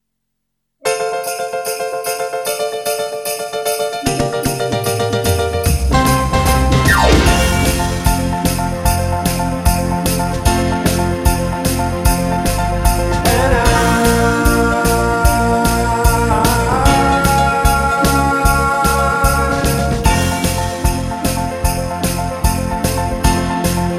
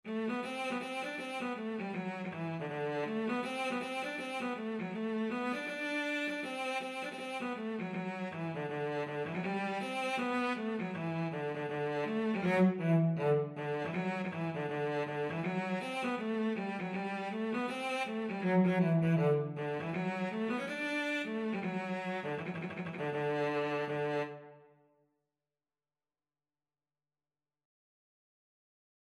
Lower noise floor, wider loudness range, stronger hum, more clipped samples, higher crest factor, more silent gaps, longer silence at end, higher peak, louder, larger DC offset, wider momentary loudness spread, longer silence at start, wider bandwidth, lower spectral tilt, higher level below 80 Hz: second, -74 dBFS vs under -90 dBFS; about the same, 5 LU vs 5 LU; neither; neither; about the same, 14 dB vs 18 dB; neither; second, 0 s vs 4.45 s; first, 0 dBFS vs -18 dBFS; first, -15 LUFS vs -35 LUFS; neither; about the same, 7 LU vs 9 LU; first, 0.85 s vs 0.05 s; first, 16 kHz vs 12.5 kHz; second, -4.5 dB/octave vs -7 dB/octave; first, -22 dBFS vs -82 dBFS